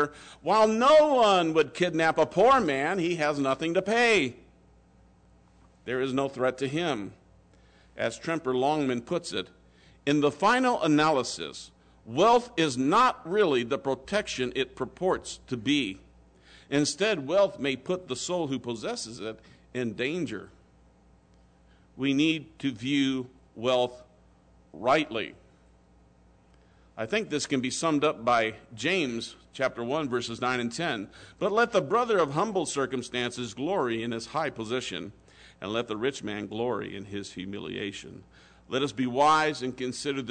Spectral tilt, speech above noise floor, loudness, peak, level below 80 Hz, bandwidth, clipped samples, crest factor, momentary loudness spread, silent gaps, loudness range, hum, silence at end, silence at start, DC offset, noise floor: -4.5 dB/octave; 32 dB; -27 LUFS; -12 dBFS; -62 dBFS; 9.4 kHz; under 0.1%; 16 dB; 14 LU; none; 8 LU; none; 0 s; 0 s; under 0.1%; -59 dBFS